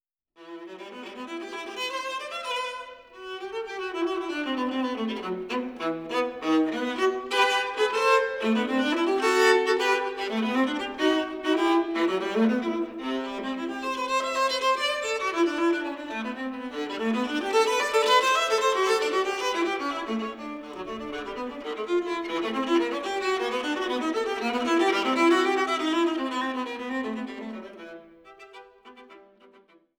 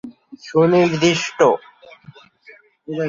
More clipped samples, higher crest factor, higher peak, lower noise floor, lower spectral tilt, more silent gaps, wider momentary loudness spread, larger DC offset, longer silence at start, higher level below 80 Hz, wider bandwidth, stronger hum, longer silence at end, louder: neither; about the same, 18 dB vs 18 dB; second, -8 dBFS vs -2 dBFS; first, -58 dBFS vs -48 dBFS; second, -3 dB/octave vs -5.5 dB/octave; neither; second, 13 LU vs 19 LU; neither; first, 0.4 s vs 0.05 s; second, -64 dBFS vs -58 dBFS; first, 18.5 kHz vs 7.6 kHz; neither; first, 0.75 s vs 0 s; second, -26 LUFS vs -17 LUFS